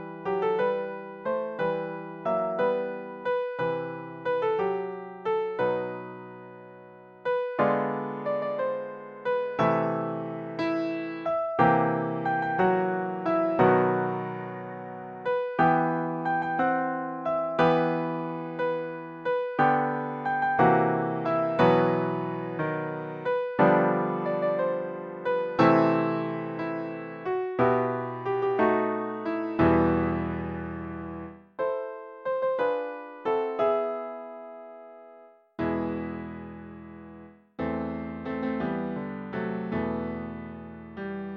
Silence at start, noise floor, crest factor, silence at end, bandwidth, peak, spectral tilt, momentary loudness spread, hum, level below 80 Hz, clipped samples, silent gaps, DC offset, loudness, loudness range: 0 s; -53 dBFS; 20 dB; 0 s; 6.6 kHz; -8 dBFS; -9 dB/octave; 15 LU; none; -56 dBFS; under 0.1%; none; under 0.1%; -28 LUFS; 7 LU